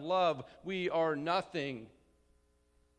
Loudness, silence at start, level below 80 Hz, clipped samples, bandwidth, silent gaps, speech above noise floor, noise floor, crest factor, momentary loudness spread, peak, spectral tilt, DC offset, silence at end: -34 LUFS; 0 s; -72 dBFS; under 0.1%; 10.5 kHz; none; 37 dB; -71 dBFS; 18 dB; 10 LU; -18 dBFS; -6 dB/octave; under 0.1%; 1.1 s